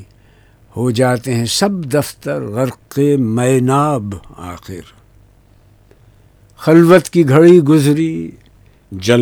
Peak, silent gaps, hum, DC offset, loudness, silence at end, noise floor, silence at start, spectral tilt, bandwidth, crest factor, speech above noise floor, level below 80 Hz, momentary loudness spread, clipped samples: 0 dBFS; none; none; under 0.1%; -13 LUFS; 0 s; -48 dBFS; 0 s; -6 dB/octave; 18.5 kHz; 14 dB; 35 dB; -48 dBFS; 23 LU; 0.4%